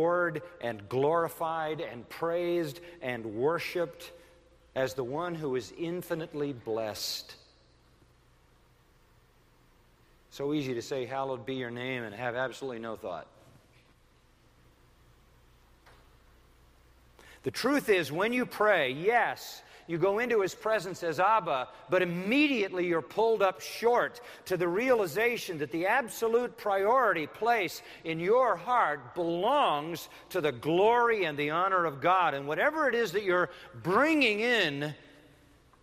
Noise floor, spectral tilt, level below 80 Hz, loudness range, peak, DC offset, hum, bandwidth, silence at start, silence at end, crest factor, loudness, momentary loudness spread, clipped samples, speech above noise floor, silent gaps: -63 dBFS; -5 dB/octave; -66 dBFS; 11 LU; -12 dBFS; under 0.1%; none; 15.5 kHz; 0 s; 0.85 s; 18 dB; -30 LUFS; 12 LU; under 0.1%; 34 dB; none